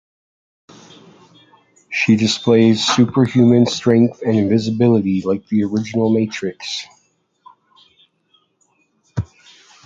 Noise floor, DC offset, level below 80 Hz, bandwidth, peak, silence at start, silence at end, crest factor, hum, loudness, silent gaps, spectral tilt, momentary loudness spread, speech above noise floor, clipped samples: -62 dBFS; under 0.1%; -50 dBFS; 7.8 kHz; -2 dBFS; 1.9 s; 0.6 s; 16 dB; none; -16 LUFS; none; -6 dB/octave; 15 LU; 47 dB; under 0.1%